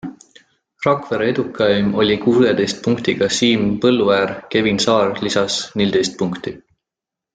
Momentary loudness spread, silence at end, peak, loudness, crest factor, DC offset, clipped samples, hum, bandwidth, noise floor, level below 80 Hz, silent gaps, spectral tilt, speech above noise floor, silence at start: 6 LU; 0.75 s; -2 dBFS; -17 LUFS; 16 dB; under 0.1%; under 0.1%; none; 9.4 kHz; -86 dBFS; -52 dBFS; none; -4.5 dB/octave; 69 dB; 0.05 s